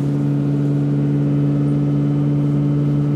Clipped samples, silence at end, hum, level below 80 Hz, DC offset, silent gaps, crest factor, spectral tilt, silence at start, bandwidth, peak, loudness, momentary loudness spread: under 0.1%; 0 s; none; -44 dBFS; under 0.1%; none; 8 dB; -10.5 dB/octave; 0 s; 4.2 kHz; -8 dBFS; -18 LUFS; 1 LU